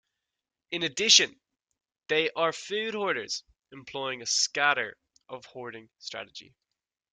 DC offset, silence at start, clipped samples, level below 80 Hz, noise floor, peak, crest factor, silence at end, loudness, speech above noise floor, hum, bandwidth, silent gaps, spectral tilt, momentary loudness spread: under 0.1%; 0.7 s; under 0.1%; -74 dBFS; -88 dBFS; -4 dBFS; 26 dB; 0.7 s; -26 LUFS; 59 dB; none; 12 kHz; none; -0.5 dB/octave; 23 LU